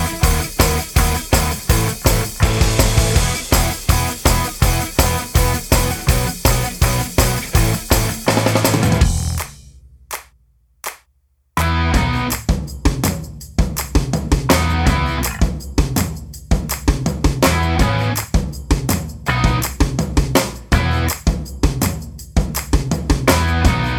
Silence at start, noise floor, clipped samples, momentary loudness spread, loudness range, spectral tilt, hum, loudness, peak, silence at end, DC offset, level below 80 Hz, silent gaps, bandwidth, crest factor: 0 s; -61 dBFS; under 0.1%; 7 LU; 4 LU; -4.5 dB/octave; none; -17 LUFS; 0 dBFS; 0 s; under 0.1%; -22 dBFS; none; over 20 kHz; 16 dB